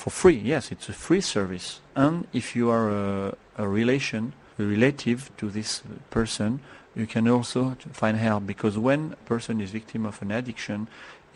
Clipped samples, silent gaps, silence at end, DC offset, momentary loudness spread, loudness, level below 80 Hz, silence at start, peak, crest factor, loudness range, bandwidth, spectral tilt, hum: under 0.1%; none; 0.2 s; under 0.1%; 10 LU; -26 LUFS; -52 dBFS; 0 s; -6 dBFS; 20 dB; 2 LU; 11.5 kHz; -5.5 dB/octave; none